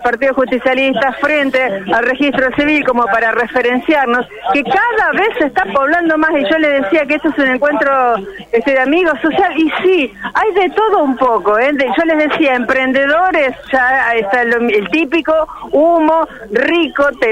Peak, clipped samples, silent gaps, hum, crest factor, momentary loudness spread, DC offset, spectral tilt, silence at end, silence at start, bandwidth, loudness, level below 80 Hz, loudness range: -2 dBFS; under 0.1%; none; none; 10 dB; 3 LU; under 0.1%; -5.5 dB/octave; 0 s; 0 s; 11.5 kHz; -12 LUFS; -46 dBFS; 1 LU